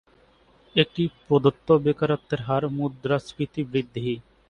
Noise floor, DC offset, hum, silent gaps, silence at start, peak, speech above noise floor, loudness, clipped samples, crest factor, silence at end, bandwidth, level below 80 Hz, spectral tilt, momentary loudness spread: -58 dBFS; under 0.1%; none; none; 0.75 s; -4 dBFS; 35 dB; -25 LUFS; under 0.1%; 22 dB; 0.3 s; 9.6 kHz; -56 dBFS; -7.5 dB/octave; 9 LU